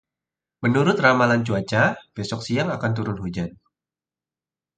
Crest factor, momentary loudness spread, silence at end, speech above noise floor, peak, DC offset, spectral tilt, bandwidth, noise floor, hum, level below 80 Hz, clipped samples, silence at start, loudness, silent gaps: 22 dB; 13 LU; 1.25 s; over 69 dB; -2 dBFS; under 0.1%; -6.5 dB/octave; 9.2 kHz; under -90 dBFS; none; -52 dBFS; under 0.1%; 0.6 s; -22 LUFS; none